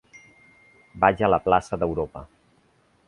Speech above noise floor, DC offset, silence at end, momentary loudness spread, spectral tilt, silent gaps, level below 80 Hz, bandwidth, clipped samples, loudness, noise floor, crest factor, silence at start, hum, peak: 40 dB; under 0.1%; 0.8 s; 13 LU; -6.5 dB/octave; none; -48 dBFS; 11 kHz; under 0.1%; -23 LUFS; -62 dBFS; 24 dB; 0.95 s; none; -2 dBFS